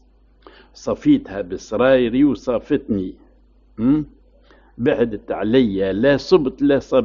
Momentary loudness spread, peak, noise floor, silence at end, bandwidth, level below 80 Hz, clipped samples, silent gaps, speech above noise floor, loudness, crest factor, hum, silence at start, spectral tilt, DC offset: 11 LU; -2 dBFS; -52 dBFS; 0 s; 7.2 kHz; -44 dBFS; under 0.1%; none; 34 dB; -19 LUFS; 16 dB; none; 0.8 s; -5.5 dB/octave; under 0.1%